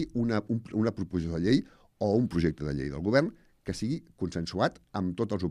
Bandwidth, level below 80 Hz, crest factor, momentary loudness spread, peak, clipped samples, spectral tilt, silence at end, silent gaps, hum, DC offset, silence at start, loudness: 11.5 kHz; -52 dBFS; 18 dB; 8 LU; -10 dBFS; under 0.1%; -7 dB/octave; 0 s; none; none; under 0.1%; 0 s; -30 LUFS